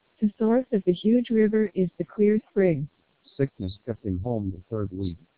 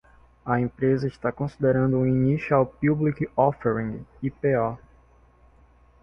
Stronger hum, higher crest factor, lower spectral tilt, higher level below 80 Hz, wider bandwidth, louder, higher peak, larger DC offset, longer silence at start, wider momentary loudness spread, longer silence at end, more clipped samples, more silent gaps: neither; about the same, 16 dB vs 18 dB; first, -12 dB/octave vs -10.5 dB/octave; about the same, -48 dBFS vs -52 dBFS; second, 4 kHz vs 6.2 kHz; about the same, -25 LUFS vs -24 LUFS; second, -10 dBFS vs -6 dBFS; first, 0.1% vs under 0.1%; second, 0.2 s vs 0.45 s; about the same, 11 LU vs 9 LU; second, 0.2 s vs 1.25 s; neither; neither